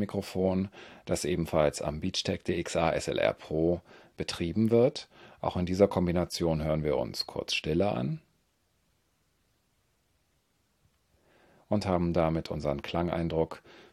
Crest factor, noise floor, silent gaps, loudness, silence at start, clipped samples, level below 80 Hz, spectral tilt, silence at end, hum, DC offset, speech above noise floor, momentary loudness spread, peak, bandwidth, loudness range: 22 dB; -73 dBFS; none; -30 LUFS; 0 s; under 0.1%; -54 dBFS; -6 dB/octave; 0.1 s; none; under 0.1%; 43 dB; 10 LU; -8 dBFS; 15 kHz; 7 LU